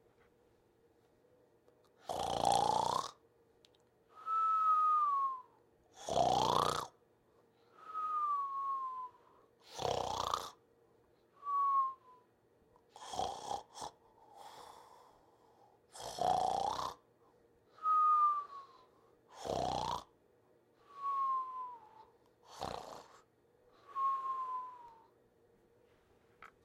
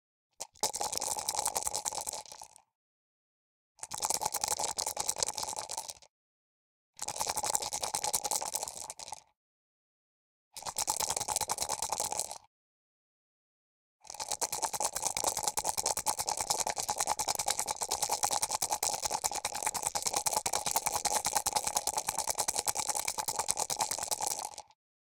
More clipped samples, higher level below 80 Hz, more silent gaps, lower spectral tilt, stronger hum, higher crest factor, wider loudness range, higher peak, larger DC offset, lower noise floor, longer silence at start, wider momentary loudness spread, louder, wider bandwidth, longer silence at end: neither; about the same, -68 dBFS vs -64 dBFS; second, none vs 2.75-3.75 s, 6.10-6.93 s, 9.36-10.51 s, 12.47-13.99 s; first, -3.5 dB/octave vs 0.5 dB/octave; neither; second, 24 dB vs 30 dB; first, 9 LU vs 5 LU; second, -16 dBFS vs -6 dBFS; neither; second, -71 dBFS vs under -90 dBFS; first, 2.05 s vs 0.4 s; first, 22 LU vs 11 LU; second, -36 LUFS vs -32 LUFS; about the same, 16.5 kHz vs 18 kHz; second, 0.2 s vs 0.55 s